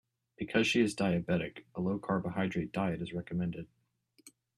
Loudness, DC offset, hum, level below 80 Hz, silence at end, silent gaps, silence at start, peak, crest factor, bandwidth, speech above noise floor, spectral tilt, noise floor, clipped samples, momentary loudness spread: -33 LUFS; under 0.1%; none; -64 dBFS; 0.3 s; none; 0.4 s; -14 dBFS; 20 dB; 12.5 kHz; 38 dB; -6 dB/octave; -71 dBFS; under 0.1%; 11 LU